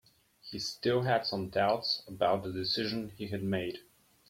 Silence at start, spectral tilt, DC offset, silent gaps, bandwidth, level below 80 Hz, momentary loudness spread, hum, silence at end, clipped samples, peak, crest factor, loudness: 0.45 s; -5 dB/octave; under 0.1%; none; 16.5 kHz; -66 dBFS; 10 LU; none; 0.5 s; under 0.1%; -16 dBFS; 18 dB; -32 LUFS